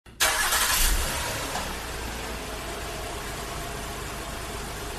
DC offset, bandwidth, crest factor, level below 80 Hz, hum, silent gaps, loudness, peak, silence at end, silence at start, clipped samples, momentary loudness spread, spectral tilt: under 0.1%; 15 kHz; 20 dB; -36 dBFS; none; none; -28 LUFS; -8 dBFS; 0 s; 0.05 s; under 0.1%; 13 LU; -1.5 dB/octave